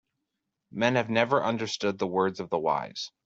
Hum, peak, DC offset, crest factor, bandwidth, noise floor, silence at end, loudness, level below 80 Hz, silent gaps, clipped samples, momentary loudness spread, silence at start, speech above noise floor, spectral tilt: none; -8 dBFS; under 0.1%; 22 dB; 8 kHz; -83 dBFS; 0.2 s; -27 LUFS; -70 dBFS; none; under 0.1%; 6 LU; 0.75 s; 55 dB; -5 dB/octave